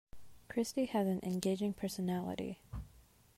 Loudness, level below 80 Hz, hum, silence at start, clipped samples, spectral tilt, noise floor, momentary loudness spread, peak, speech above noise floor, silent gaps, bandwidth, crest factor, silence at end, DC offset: -37 LUFS; -58 dBFS; none; 0.15 s; under 0.1%; -6 dB/octave; -64 dBFS; 14 LU; -20 dBFS; 27 dB; none; 16 kHz; 18 dB; 0.35 s; under 0.1%